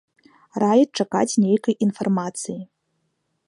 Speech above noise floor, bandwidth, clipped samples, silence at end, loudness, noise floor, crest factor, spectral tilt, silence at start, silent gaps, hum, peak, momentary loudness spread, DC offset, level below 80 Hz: 52 dB; 11 kHz; under 0.1%; 0.85 s; -21 LUFS; -72 dBFS; 18 dB; -5.5 dB/octave; 0.55 s; none; none; -6 dBFS; 14 LU; under 0.1%; -72 dBFS